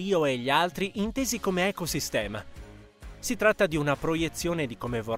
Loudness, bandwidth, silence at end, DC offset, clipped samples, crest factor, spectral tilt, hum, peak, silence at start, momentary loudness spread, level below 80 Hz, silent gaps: -27 LUFS; 16 kHz; 0 s; under 0.1%; under 0.1%; 20 dB; -4 dB/octave; none; -8 dBFS; 0 s; 10 LU; -48 dBFS; none